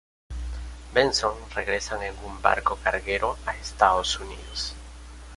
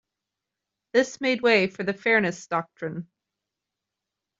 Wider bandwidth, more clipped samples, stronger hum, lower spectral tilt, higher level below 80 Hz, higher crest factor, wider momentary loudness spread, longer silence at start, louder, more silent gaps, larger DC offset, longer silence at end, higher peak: first, 11.5 kHz vs 7.8 kHz; neither; neither; second, -3 dB/octave vs -4.5 dB/octave; first, -40 dBFS vs -72 dBFS; about the same, 24 dB vs 22 dB; first, 17 LU vs 14 LU; second, 0.3 s vs 0.95 s; about the same, -26 LUFS vs -24 LUFS; neither; neither; second, 0 s vs 1.35 s; first, -2 dBFS vs -6 dBFS